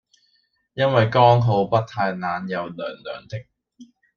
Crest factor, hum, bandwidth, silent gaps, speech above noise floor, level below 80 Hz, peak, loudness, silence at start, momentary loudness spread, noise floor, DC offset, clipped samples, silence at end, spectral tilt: 20 dB; none; 6.8 kHz; none; 46 dB; -58 dBFS; -2 dBFS; -20 LUFS; 0.75 s; 20 LU; -67 dBFS; under 0.1%; under 0.1%; 0.35 s; -7.5 dB/octave